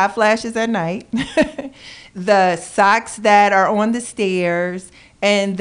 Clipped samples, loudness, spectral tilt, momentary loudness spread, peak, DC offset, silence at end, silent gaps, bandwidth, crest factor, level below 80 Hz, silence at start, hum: under 0.1%; -17 LUFS; -4.5 dB/octave; 13 LU; -2 dBFS; under 0.1%; 0 s; none; 10.5 kHz; 14 dB; -50 dBFS; 0 s; none